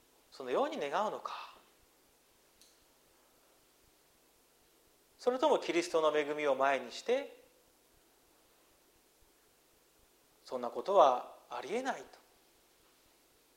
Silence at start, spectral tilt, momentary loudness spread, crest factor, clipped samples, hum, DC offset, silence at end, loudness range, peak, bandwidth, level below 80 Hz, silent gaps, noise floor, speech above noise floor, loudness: 0.35 s; -3.5 dB/octave; 17 LU; 24 dB; under 0.1%; none; under 0.1%; 1.5 s; 11 LU; -12 dBFS; 16 kHz; -80 dBFS; none; -68 dBFS; 36 dB; -34 LUFS